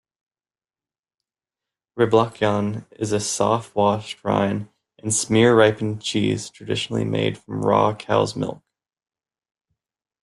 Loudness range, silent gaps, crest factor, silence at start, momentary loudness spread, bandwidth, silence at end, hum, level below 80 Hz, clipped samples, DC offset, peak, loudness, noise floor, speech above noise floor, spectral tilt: 4 LU; none; 20 dB; 1.95 s; 11 LU; 12.5 kHz; 1.7 s; none; -58 dBFS; under 0.1%; under 0.1%; -2 dBFS; -21 LUFS; under -90 dBFS; over 69 dB; -5 dB/octave